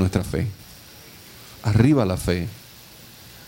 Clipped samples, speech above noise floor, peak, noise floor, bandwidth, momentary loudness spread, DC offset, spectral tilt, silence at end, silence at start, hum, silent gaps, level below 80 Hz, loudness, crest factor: under 0.1%; 25 dB; -4 dBFS; -45 dBFS; 16.5 kHz; 25 LU; under 0.1%; -7 dB/octave; 0 s; 0 s; none; none; -42 dBFS; -22 LUFS; 20 dB